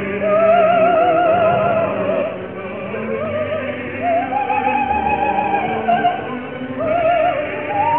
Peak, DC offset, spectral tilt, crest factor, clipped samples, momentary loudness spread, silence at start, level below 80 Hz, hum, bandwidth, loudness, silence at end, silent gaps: -4 dBFS; 0.4%; -10.5 dB/octave; 14 dB; under 0.1%; 11 LU; 0 s; -46 dBFS; none; 3.9 kHz; -17 LUFS; 0 s; none